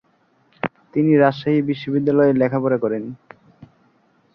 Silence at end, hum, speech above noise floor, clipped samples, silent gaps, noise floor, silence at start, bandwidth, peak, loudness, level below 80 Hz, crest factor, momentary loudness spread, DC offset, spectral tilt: 0.7 s; none; 43 dB; under 0.1%; none; -61 dBFS; 0.65 s; 5.8 kHz; -2 dBFS; -19 LUFS; -62 dBFS; 18 dB; 14 LU; under 0.1%; -10 dB/octave